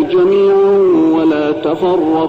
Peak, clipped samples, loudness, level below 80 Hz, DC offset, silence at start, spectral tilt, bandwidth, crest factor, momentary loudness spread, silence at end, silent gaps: -4 dBFS; under 0.1%; -11 LUFS; -50 dBFS; under 0.1%; 0 s; -8 dB/octave; 5.2 kHz; 6 dB; 5 LU; 0 s; none